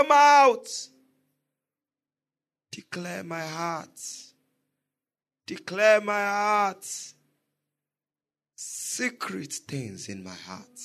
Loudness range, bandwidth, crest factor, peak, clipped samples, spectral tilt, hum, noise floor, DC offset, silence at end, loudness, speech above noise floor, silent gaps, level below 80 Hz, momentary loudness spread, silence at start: 10 LU; 13.5 kHz; 22 dB; -6 dBFS; under 0.1%; -3 dB/octave; none; under -90 dBFS; under 0.1%; 0 s; -25 LUFS; over 65 dB; none; -80 dBFS; 22 LU; 0 s